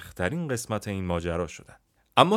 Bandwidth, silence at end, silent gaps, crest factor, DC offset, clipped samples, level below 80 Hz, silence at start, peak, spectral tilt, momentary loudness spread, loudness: 16 kHz; 0 s; none; 26 dB; under 0.1%; under 0.1%; -54 dBFS; 0 s; -2 dBFS; -5 dB/octave; 8 LU; -29 LUFS